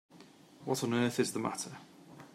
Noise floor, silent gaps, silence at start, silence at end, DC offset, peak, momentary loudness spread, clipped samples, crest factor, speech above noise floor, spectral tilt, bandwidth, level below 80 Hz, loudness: -58 dBFS; none; 0.15 s; 0.05 s; under 0.1%; -16 dBFS; 22 LU; under 0.1%; 20 dB; 24 dB; -4.5 dB/octave; 16 kHz; -78 dBFS; -34 LUFS